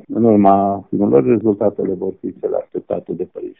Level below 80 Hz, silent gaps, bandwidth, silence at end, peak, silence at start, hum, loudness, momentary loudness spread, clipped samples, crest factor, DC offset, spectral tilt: -56 dBFS; none; 3.5 kHz; 0.1 s; 0 dBFS; 0.1 s; none; -17 LUFS; 13 LU; under 0.1%; 16 dB; under 0.1%; -10.5 dB/octave